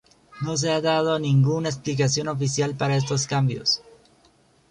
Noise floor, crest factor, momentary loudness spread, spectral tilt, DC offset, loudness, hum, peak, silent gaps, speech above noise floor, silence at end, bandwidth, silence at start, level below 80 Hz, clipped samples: -59 dBFS; 16 dB; 6 LU; -5 dB/octave; under 0.1%; -23 LUFS; none; -8 dBFS; none; 37 dB; 0.95 s; 10.5 kHz; 0.35 s; -58 dBFS; under 0.1%